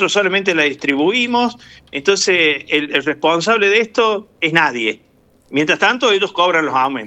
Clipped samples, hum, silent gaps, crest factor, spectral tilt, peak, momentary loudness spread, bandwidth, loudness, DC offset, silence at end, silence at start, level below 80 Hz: under 0.1%; none; none; 16 dB; -3 dB/octave; 0 dBFS; 7 LU; 9.2 kHz; -15 LUFS; under 0.1%; 0 s; 0 s; -60 dBFS